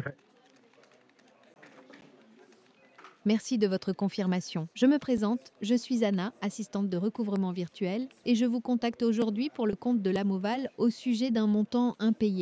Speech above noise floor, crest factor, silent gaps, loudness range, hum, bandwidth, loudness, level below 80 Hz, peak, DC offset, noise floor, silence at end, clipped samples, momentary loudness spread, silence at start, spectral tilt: 33 dB; 16 dB; none; 5 LU; none; 8 kHz; -30 LUFS; -68 dBFS; -14 dBFS; under 0.1%; -62 dBFS; 0 s; under 0.1%; 6 LU; 0 s; -6.5 dB/octave